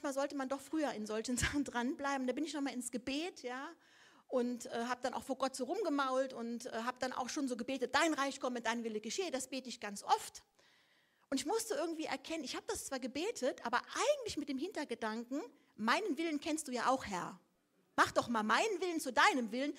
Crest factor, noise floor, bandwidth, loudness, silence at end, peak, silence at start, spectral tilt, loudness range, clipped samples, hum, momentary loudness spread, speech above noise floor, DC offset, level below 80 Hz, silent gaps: 22 dB; -76 dBFS; 16 kHz; -38 LUFS; 0 s; -16 dBFS; 0 s; -3 dB/octave; 4 LU; under 0.1%; none; 9 LU; 38 dB; under 0.1%; -66 dBFS; none